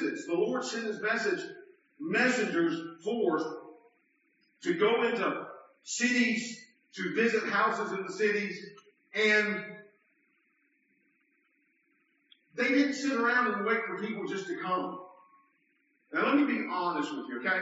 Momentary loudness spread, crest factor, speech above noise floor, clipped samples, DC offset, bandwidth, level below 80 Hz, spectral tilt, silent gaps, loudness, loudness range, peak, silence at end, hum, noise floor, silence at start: 14 LU; 18 dB; 43 dB; under 0.1%; under 0.1%; 8 kHz; -86 dBFS; -2.5 dB/octave; none; -30 LUFS; 4 LU; -14 dBFS; 0 s; none; -73 dBFS; 0 s